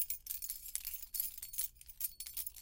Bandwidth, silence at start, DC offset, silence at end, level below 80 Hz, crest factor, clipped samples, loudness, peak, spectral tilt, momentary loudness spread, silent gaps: 17 kHz; 0 s; under 0.1%; 0 s; -62 dBFS; 28 dB; under 0.1%; -40 LUFS; -14 dBFS; 2 dB/octave; 3 LU; none